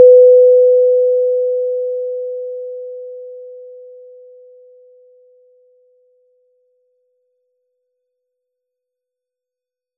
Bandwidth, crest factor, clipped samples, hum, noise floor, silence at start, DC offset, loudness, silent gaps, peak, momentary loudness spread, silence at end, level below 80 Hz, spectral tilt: 0.6 kHz; 16 dB; under 0.1%; none; -87 dBFS; 0 s; under 0.1%; -12 LUFS; none; 0 dBFS; 27 LU; 6.25 s; under -90 dBFS; -10 dB/octave